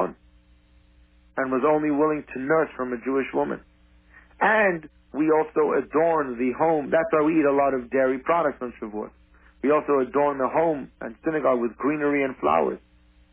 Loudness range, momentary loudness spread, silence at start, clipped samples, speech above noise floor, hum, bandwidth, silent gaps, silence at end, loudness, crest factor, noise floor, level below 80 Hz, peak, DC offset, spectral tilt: 3 LU; 12 LU; 0 s; under 0.1%; 34 dB; none; 3.7 kHz; none; 0.55 s; -23 LUFS; 16 dB; -57 dBFS; -56 dBFS; -8 dBFS; under 0.1%; -10 dB/octave